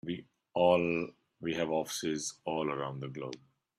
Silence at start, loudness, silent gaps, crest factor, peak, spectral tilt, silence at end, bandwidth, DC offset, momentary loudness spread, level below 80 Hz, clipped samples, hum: 0.05 s; -34 LUFS; none; 20 dB; -14 dBFS; -4.5 dB/octave; 0.4 s; 14.5 kHz; under 0.1%; 16 LU; -70 dBFS; under 0.1%; none